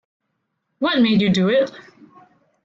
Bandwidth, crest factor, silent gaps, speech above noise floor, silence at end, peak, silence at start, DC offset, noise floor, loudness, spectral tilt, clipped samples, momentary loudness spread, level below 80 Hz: 7.6 kHz; 14 dB; none; 57 dB; 0.85 s; -8 dBFS; 0.8 s; under 0.1%; -74 dBFS; -18 LUFS; -6.5 dB/octave; under 0.1%; 8 LU; -58 dBFS